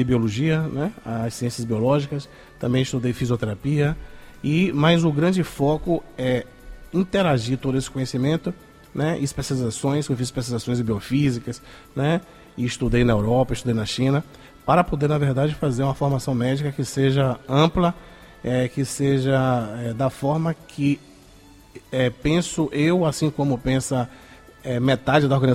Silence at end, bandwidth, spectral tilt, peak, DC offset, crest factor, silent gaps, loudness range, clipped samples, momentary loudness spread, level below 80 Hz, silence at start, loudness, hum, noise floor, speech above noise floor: 0 s; 15 kHz; -6.5 dB/octave; -4 dBFS; under 0.1%; 18 dB; none; 3 LU; under 0.1%; 10 LU; -42 dBFS; 0 s; -22 LUFS; none; -48 dBFS; 27 dB